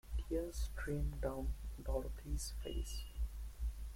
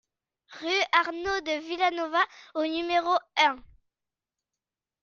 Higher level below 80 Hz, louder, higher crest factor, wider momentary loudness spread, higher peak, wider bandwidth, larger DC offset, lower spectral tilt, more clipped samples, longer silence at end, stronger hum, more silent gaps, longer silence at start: first, -42 dBFS vs -62 dBFS; second, -44 LUFS vs -26 LUFS; second, 16 dB vs 24 dB; second, 5 LU vs 8 LU; second, -26 dBFS vs -6 dBFS; first, 16.5 kHz vs 7.2 kHz; neither; first, -5.5 dB/octave vs -2 dB/octave; neither; second, 0 s vs 1.4 s; neither; neither; second, 0.05 s vs 0.5 s